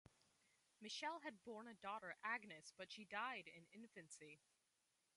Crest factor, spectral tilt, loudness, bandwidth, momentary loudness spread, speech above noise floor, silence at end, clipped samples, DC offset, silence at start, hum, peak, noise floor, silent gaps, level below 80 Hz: 22 dB; -2.5 dB/octave; -53 LUFS; 11.5 kHz; 13 LU; 33 dB; 0.8 s; under 0.1%; under 0.1%; 0.8 s; none; -34 dBFS; -87 dBFS; none; under -90 dBFS